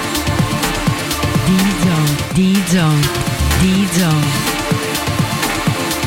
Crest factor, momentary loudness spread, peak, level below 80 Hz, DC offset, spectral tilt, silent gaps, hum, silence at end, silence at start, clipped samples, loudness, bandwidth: 10 dB; 4 LU; -4 dBFS; -28 dBFS; under 0.1%; -4.5 dB/octave; none; none; 0 s; 0 s; under 0.1%; -15 LUFS; 16.5 kHz